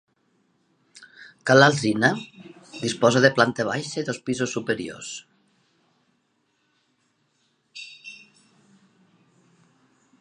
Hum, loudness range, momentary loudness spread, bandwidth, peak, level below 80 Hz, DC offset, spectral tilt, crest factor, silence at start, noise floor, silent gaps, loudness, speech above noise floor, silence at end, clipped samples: none; 15 LU; 25 LU; 11.5 kHz; 0 dBFS; -68 dBFS; under 0.1%; -4.5 dB/octave; 26 dB; 1 s; -70 dBFS; none; -22 LUFS; 49 dB; 2.05 s; under 0.1%